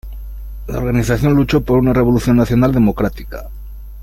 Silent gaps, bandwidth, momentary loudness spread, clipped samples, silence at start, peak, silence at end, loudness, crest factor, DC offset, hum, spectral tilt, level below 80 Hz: none; 16.5 kHz; 20 LU; under 0.1%; 0.05 s; -2 dBFS; 0 s; -15 LUFS; 14 dB; under 0.1%; none; -7.5 dB/octave; -28 dBFS